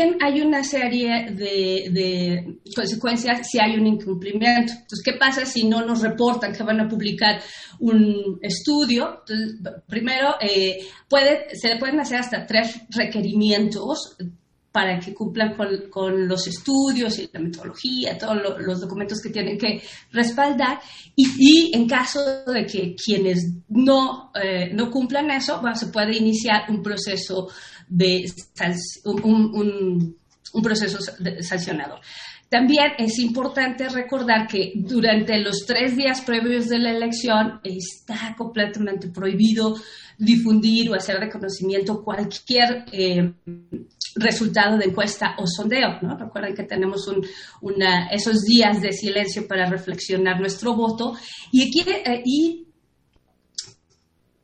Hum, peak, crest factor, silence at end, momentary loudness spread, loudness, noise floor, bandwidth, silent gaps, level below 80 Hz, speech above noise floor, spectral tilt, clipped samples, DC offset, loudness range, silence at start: none; 0 dBFS; 20 dB; 0.75 s; 11 LU; -21 LUFS; -65 dBFS; 9.8 kHz; none; -58 dBFS; 44 dB; -4.5 dB/octave; under 0.1%; under 0.1%; 5 LU; 0 s